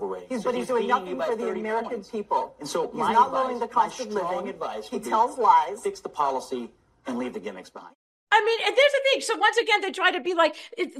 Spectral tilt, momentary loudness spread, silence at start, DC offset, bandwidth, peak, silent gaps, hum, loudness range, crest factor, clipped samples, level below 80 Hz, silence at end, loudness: -3 dB/octave; 13 LU; 0 s; under 0.1%; 14 kHz; -6 dBFS; 7.95-8.27 s; none; 4 LU; 20 dB; under 0.1%; -68 dBFS; 0 s; -24 LUFS